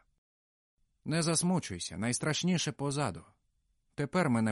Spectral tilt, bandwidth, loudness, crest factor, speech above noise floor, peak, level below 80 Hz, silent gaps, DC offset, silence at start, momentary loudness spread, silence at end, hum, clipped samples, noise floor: -4.5 dB/octave; 11.5 kHz; -32 LUFS; 16 dB; 44 dB; -16 dBFS; -64 dBFS; none; under 0.1%; 1.05 s; 10 LU; 0 s; none; under 0.1%; -76 dBFS